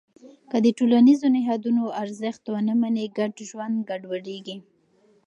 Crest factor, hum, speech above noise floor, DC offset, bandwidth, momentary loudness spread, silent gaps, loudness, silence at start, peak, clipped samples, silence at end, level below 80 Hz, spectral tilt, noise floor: 16 dB; none; 39 dB; under 0.1%; 8.6 kHz; 17 LU; none; -23 LUFS; 0.25 s; -8 dBFS; under 0.1%; 0.7 s; -76 dBFS; -6 dB/octave; -61 dBFS